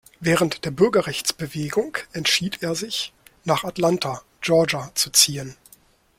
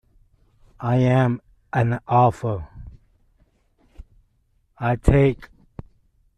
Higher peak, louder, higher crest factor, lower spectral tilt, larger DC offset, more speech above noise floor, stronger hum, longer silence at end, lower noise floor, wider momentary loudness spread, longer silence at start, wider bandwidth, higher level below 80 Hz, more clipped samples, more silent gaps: about the same, 0 dBFS vs -2 dBFS; about the same, -21 LUFS vs -21 LUFS; about the same, 22 dB vs 20 dB; second, -3 dB/octave vs -8.5 dB/octave; neither; second, 33 dB vs 46 dB; neither; second, 0.65 s vs 0.95 s; second, -55 dBFS vs -65 dBFS; second, 11 LU vs 24 LU; second, 0.2 s vs 0.8 s; first, 16.5 kHz vs 9.6 kHz; second, -56 dBFS vs -36 dBFS; neither; neither